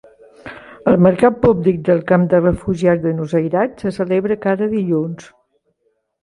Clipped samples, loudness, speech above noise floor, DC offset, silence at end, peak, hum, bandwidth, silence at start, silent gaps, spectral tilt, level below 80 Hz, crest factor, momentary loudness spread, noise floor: under 0.1%; -16 LUFS; 51 dB; under 0.1%; 1 s; 0 dBFS; none; 11 kHz; 0.45 s; none; -9 dB/octave; -44 dBFS; 16 dB; 10 LU; -66 dBFS